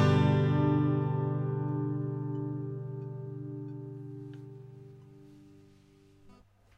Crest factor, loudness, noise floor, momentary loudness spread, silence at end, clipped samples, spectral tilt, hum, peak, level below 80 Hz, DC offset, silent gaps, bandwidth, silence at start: 18 dB; -31 LUFS; -60 dBFS; 21 LU; 0.45 s; under 0.1%; -9 dB/octave; 50 Hz at -65 dBFS; -14 dBFS; -62 dBFS; under 0.1%; none; 7.6 kHz; 0 s